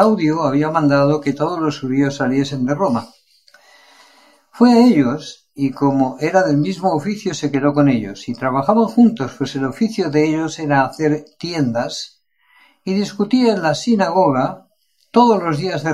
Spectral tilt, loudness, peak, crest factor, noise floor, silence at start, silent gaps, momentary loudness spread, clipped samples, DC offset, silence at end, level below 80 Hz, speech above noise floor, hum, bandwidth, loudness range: -6.5 dB/octave; -17 LUFS; 0 dBFS; 16 dB; -61 dBFS; 0 s; none; 10 LU; under 0.1%; 0.2%; 0 s; -60 dBFS; 45 dB; none; 12 kHz; 4 LU